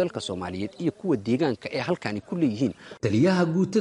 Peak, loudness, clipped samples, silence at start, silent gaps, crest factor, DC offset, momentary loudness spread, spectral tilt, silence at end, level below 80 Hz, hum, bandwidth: -10 dBFS; -26 LUFS; under 0.1%; 0 s; none; 14 dB; under 0.1%; 10 LU; -6.5 dB/octave; 0 s; -62 dBFS; none; 11 kHz